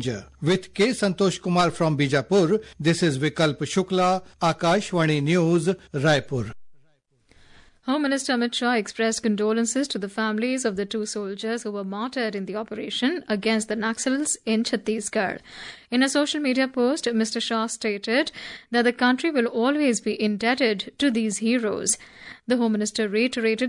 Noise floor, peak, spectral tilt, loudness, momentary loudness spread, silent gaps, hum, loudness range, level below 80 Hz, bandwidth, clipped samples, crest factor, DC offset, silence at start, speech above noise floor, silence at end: -62 dBFS; -8 dBFS; -4.5 dB/octave; -23 LUFS; 8 LU; none; none; 4 LU; -60 dBFS; 11 kHz; under 0.1%; 16 dB; under 0.1%; 0 s; 38 dB; 0 s